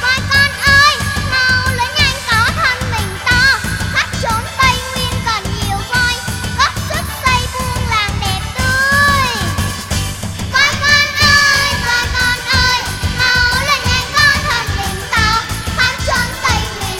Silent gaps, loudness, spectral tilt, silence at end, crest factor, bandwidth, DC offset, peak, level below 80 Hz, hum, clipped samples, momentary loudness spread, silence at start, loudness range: none; -13 LUFS; -2.5 dB/octave; 0 s; 14 dB; 17 kHz; under 0.1%; 0 dBFS; -26 dBFS; none; under 0.1%; 9 LU; 0 s; 4 LU